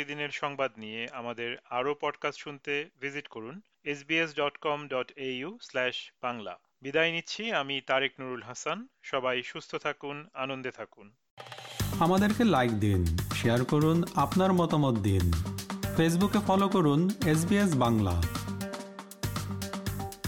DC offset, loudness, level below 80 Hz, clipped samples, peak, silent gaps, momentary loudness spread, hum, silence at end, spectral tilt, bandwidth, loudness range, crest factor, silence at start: under 0.1%; -30 LUFS; -48 dBFS; under 0.1%; -12 dBFS; 11.31-11.37 s; 14 LU; none; 0 s; -5.5 dB/octave; 17.5 kHz; 8 LU; 18 dB; 0 s